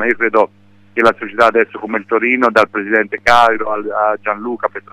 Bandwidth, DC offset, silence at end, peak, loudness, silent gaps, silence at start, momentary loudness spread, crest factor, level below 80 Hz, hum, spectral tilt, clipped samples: 15 kHz; under 0.1%; 0.15 s; 0 dBFS; -14 LUFS; none; 0 s; 9 LU; 14 dB; -48 dBFS; none; -4.5 dB/octave; under 0.1%